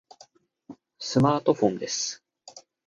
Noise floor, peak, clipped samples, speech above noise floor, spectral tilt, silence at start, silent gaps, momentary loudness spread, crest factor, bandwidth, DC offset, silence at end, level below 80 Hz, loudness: -57 dBFS; -8 dBFS; under 0.1%; 33 dB; -5 dB/octave; 0.7 s; none; 25 LU; 20 dB; 10.5 kHz; under 0.1%; 0.3 s; -62 dBFS; -25 LUFS